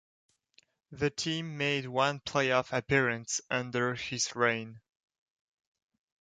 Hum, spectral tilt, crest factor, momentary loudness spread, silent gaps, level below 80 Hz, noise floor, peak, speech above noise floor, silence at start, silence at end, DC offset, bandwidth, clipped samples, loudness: none; -3.5 dB/octave; 22 dB; 6 LU; none; -64 dBFS; -68 dBFS; -12 dBFS; 37 dB; 0.9 s; 1.45 s; under 0.1%; 9.6 kHz; under 0.1%; -31 LUFS